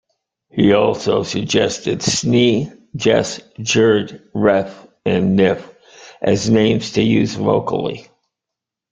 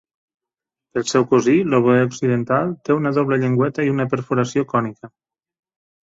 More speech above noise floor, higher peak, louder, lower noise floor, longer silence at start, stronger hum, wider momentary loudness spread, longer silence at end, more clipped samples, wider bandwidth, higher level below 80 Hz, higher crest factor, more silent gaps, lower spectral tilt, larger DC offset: about the same, 68 dB vs 69 dB; about the same, 0 dBFS vs -2 dBFS; about the same, -17 LUFS vs -19 LUFS; about the same, -84 dBFS vs -87 dBFS; second, 0.55 s vs 0.95 s; neither; first, 11 LU vs 6 LU; about the same, 0.9 s vs 0.95 s; neither; first, 9.4 kHz vs 8 kHz; first, -50 dBFS vs -58 dBFS; about the same, 16 dB vs 18 dB; neither; second, -5 dB/octave vs -6.5 dB/octave; neither